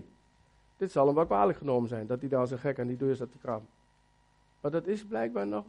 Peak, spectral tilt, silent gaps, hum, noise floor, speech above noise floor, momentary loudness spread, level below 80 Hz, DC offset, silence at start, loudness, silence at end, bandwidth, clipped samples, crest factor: -12 dBFS; -8.5 dB/octave; none; 50 Hz at -65 dBFS; -67 dBFS; 37 dB; 12 LU; -64 dBFS; under 0.1%; 0 s; -31 LUFS; 0 s; 10.5 kHz; under 0.1%; 18 dB